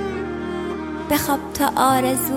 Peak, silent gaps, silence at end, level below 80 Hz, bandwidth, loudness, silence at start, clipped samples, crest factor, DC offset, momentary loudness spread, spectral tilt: -4 dBFS; none; 0 s; -44 dBFS; 16.5 kHz; -21 LUFS; 0 s; under 0.1%; 18 dB; under 0.1%; 10 LU; -4 dB/octave